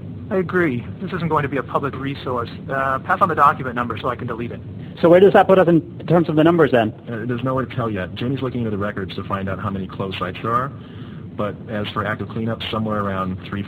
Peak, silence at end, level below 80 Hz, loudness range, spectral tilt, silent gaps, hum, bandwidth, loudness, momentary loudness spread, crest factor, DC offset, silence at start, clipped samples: 0 dBFS; 0 s; -50 dBFS; 9 LU; -8.5 dB/octave; none; none; 15.5 kHz; -20 LUFS; 13 LU; 20 dB; under 0.1%; 0 s; under 0.1%